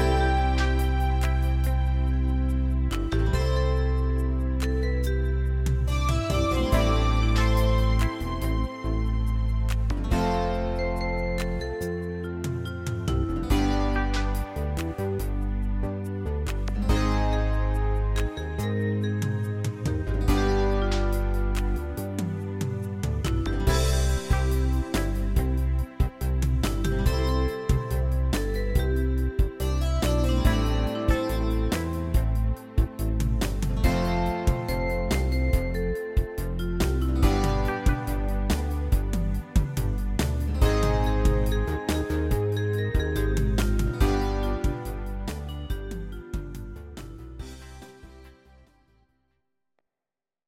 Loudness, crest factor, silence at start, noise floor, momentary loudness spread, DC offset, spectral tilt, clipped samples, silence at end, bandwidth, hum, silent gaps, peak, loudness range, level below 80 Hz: -27 LUFS; 18 dB; 0 s; under -90 dBFS; 7 LU; under 0.1%; -6.5 dB/octave; under 0.1%; 2.15 s; 16 kHz; none; none; -8 dBFS; 4 LU; -26 dBFS